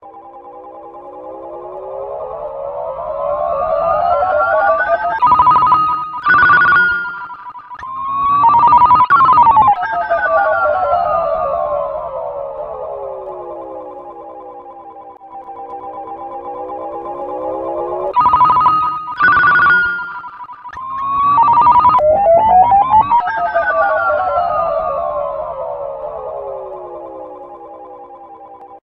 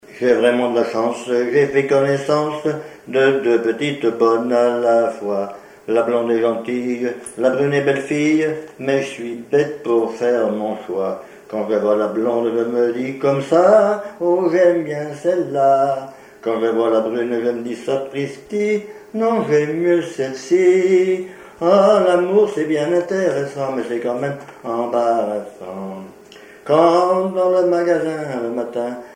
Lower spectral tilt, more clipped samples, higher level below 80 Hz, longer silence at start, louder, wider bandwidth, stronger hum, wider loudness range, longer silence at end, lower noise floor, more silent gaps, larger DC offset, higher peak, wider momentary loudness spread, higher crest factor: about the same, -7 dB/octave vs -6 dB/octave; neither; first, -46 dBFS vs -64 dBFS; about the same, 0.05 s vs 0.1 s; first, -13 LUFS vs -18 LUFS; second, 5.8 kHz vs 11 kHz; neither; first, 17 LU vs 4 LU; about the same, 0.05 s vs 0 s; second, -36 dBFS vs -42 dBFS; neither; neither; about the same, 0 dBFS vs 0 dBFS; first, 23 LU vs 11 LU; about the same, 14 dB vs 16 dB